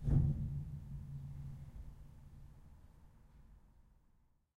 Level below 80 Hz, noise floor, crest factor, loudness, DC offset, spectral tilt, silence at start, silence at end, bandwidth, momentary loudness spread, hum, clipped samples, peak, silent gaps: -48 dBFS; -72 dBFS; 22 dB; -42 LUFS; under 0.1%; -10.5 dB/octave; 0 s; 0.9 s; 2.5 kHz; 27 LU; none; under 0.1%; -20 dBFS; none